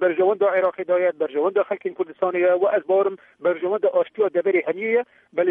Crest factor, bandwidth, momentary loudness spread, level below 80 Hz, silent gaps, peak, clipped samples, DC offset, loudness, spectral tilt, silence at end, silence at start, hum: 12 dB; 3.8 kHz; 7 LU; -78 dBFS; none; -8 dBFS; under 0.1%; under 0.1%; -22 LUFS; -8.5 dB/octave; 0 s; 0 s; none